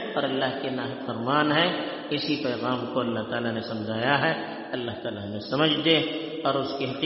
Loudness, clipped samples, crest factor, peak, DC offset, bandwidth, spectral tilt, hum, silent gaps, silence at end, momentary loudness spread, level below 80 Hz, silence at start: -26 LUFS; under 0.1%; 20 dB; -6 dBFS; under 0.1%; 6 kHz; -2.5 dB/octave; none; none; 0 s; 10 LU; -66 dBFS; 0 s